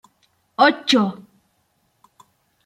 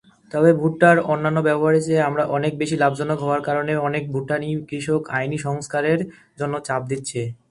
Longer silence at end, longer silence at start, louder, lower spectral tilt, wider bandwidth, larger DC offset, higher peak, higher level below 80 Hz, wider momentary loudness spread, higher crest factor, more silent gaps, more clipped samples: first, 1.5 s vs 0.15 s; first, 0.6 s vs 0.35 s; first, -18 LUFS vs -21 LUFS; second, -4 dB/octave vs -6.5 dB/octave; first, 13.5 kHz vs 11.5 kHz; neither; about the same, -2 dBFS vs 0 dBFS; second, -72 dBFS vs -58 dBFS; first, 20 LU vs 10 LU; about the same, 22 dB vs 20 dB; neither; neither